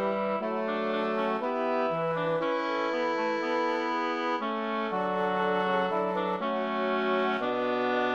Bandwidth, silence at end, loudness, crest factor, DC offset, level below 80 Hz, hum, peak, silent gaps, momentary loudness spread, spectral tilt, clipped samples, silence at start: 8 kHz; 0 s; -29 LUFS; 14 dB; under 0.1%; -72 dBFS; none; -14 dBFS; none; 3 LU; -6 dB/octave; under 0.1%; 0 s